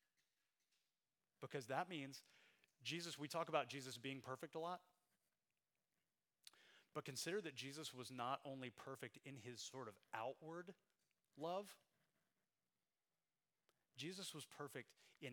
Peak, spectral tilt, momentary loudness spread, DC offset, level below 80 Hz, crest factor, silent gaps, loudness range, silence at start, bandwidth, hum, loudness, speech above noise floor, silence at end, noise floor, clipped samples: -26 dBFS; -3.5 dB/octave; 14 LU; under 0.1%; under -90 dBFS; 28 dB; none; 8 LU; 1.4 s; 19.5 kHz; none; -51 LUFS; over 39 dB; 0 s; under -90 dBFS; under 0.1%